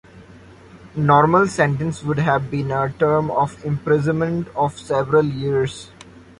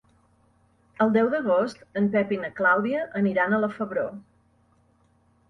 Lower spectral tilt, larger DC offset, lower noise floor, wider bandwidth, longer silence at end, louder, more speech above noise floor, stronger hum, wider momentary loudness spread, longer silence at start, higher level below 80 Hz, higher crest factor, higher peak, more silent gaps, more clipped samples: about the same, -7 dB/octave vs -7.5 dB/octave; neither; second, -44 dBFS vs -63 dBFS; first, 11.5 kHz vs 7.4 kHz; second, 0.2 s vs 1.3 s; first, -19 LUFS vs -24 LUFS; second, 25 dB vs 39 dB; neither; about the same, 8 LU vs 8 LU; second, 0.15 s vs 1 s; first, -48 dBFS vs -66 dBFS; about the same, 18 dB vs 18 dB; first, -2 dBFS vs -8 dBFS; neither; neither